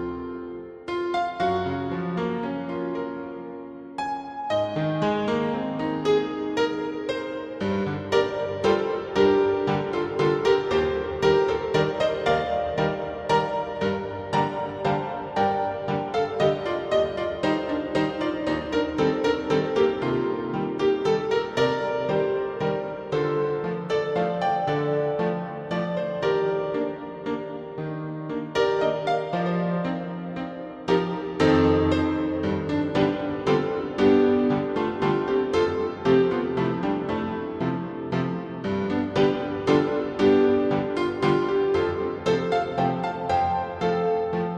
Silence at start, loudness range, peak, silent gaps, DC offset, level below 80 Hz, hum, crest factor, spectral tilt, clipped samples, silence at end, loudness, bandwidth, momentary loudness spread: 0 s; 5 LU; -6 dBFS; none; under 0.1%; -52 dBFS; none; 18 dB; -7 dB/octave; under 0.1%; 0 s; -25 LUFS; 8.6 kHz; 9 LU